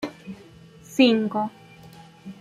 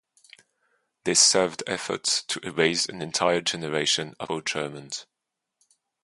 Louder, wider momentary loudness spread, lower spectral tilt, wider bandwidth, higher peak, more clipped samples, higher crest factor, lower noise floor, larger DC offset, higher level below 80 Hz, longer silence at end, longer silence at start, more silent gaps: about the same, -22 LUFS vs -24 LUFS; first, 25 LU vs 15 LU; first, -5 dB/octave vs -1.5 dB/octave; first, 14.5 kHz vs 11.5 kHz; about the same, -6 dBFS vs -4 dBFS; neither; about the same, 20 dB vs 22 dB; second, -48 dBFS vs -84 dBFS; neither; about the same, -66 dBFS vs -66 dBFS; second, 0.05 s vs 1 s; second, 0 s vs 1.05 s; neither